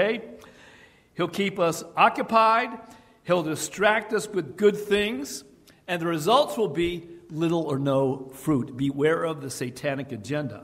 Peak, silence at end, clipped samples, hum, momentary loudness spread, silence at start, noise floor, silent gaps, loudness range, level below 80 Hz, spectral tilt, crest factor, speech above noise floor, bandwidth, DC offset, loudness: -4 dBFS; 0 s; under 0.1%; none; 12 LU; 0 s; -53 dBFS; none; 3 LU; -58 dBFS; -5 dB/octave; 20 dB; 29 dB; 16 kHz; under 0.1%; -25 LUFS